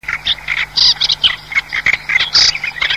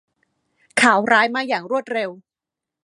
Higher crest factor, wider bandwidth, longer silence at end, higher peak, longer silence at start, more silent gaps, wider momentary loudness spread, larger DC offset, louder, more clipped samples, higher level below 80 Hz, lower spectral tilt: second, 14 dB vs 20 dB; first, 16 kHz vs 11.5 kHz; second, 0 s vs 0.7 s; about the same, 0 dBFS vs 0 dBFS; second, 0.05 s vs 0.75 s; neither; second, 7 LU vs 11 LU; first, 0.3% vs under 0.1%; first, -12 LUFS vs -18 LUFS; neither; first, -42 dBFS vs -72 dBFS; second, 1 dB/octave vs -3 dB/octave